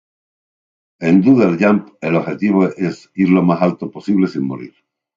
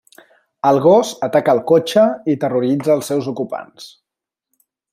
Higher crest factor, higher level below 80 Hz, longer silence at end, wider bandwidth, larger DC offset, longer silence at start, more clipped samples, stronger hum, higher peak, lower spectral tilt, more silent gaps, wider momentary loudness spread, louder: about the same, 16 dB vs 16 dB; about the same, -60 dBFS vs -64 dBFS; second, 0.5 s vs 1.05 s; second, 7.4 kHz vs 16 kHz; neither; first, 1 s vs 0.65 s; neither; neither; about the same, 0 dBFS vs -2 dBFS; first, -8.5 dB/octave vs -6 dB/octave; neither; about the same, 11 LU vs 12 LU; about the same, -16 LUFS vs -16 LUFS